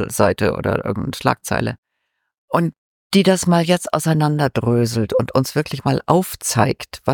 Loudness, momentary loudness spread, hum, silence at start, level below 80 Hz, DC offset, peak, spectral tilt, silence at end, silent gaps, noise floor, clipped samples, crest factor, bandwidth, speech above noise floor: -19 LUFS; 7 LU; none; 0 s; -46 dBFS; under 0.1%; 0 dBFS; -5.5 dB/octave; 0 s; 1.78-1.83 s, 2.38-2.48 s, 2.78-3.10 s; -74 dBFS; under 0.1%; 18 dB; 17.5 kHz; 56 dB